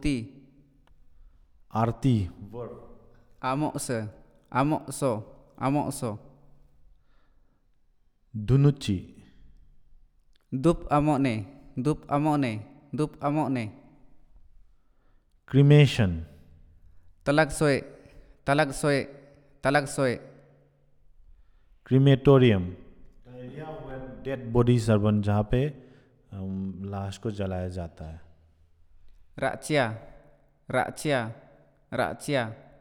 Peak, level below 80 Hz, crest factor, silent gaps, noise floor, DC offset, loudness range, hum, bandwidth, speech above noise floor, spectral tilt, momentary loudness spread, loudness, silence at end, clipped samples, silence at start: -6 dBFS; -48 dBFS; 22 dB; none; -63 dBFS; under 0.1%; 8 LU; none; 13 kHz; 38 dB; -6.5 dB/octave; 18 LU; -26 LUFS; 0.25 s; under 0.1%; 0 s